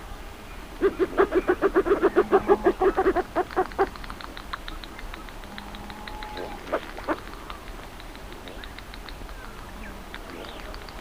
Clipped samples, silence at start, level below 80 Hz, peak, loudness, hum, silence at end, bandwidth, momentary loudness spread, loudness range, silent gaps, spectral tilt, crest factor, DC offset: under 0.1%; 0 s; -42 dBFS; -6 dBFS; -25 LUFS; none; 0 s; 16 kHz; 19 LU; 17 LU; none; -5.5 dB/octave; 20 dB; 0.3%